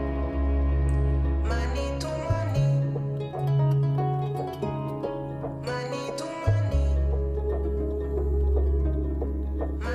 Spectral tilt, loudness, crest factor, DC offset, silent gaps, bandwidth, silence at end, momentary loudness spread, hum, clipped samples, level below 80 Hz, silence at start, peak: -8 dB/octave; -27 LUFS; 14 dB; under 0.1%; none; 9.8 kHz; 0 s; 7 LU; none; under 0.1%; -28 dBFS; 0 s; -12 dBFS